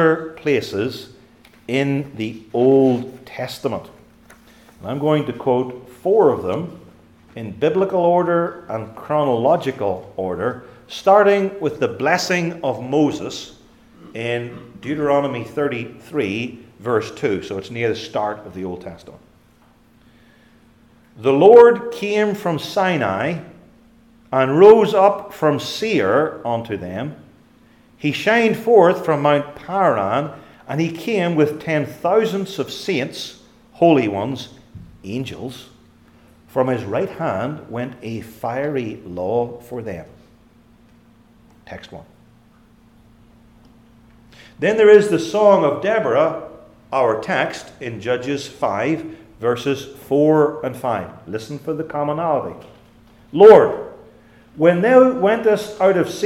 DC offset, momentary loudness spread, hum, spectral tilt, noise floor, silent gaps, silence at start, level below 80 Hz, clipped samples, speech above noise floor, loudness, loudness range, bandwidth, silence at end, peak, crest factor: under 0.1%; 18 LU; none; -6 dB/octave; -53 dBFS; none; 0 s; -58 dBFS; under 0.1%; 35 dB; -18 LUFS; 10 LU; 15.5 kHz; 0 s; 0 dBFS; 18 dB